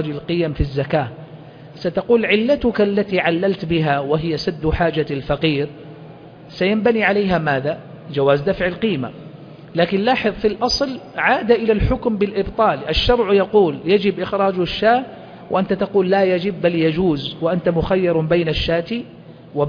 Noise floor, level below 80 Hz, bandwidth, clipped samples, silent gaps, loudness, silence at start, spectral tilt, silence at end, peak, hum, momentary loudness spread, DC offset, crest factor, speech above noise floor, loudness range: -39 dBFS; -36 dBFS; 5.4 kHz; under 0.1%; none; -18 LUFS; 0 s; -6.5 dB/octave; 0 s; -2 dBFS; none; 11 LU; under 0.1%; 16 dB; 21 dB; 3 LU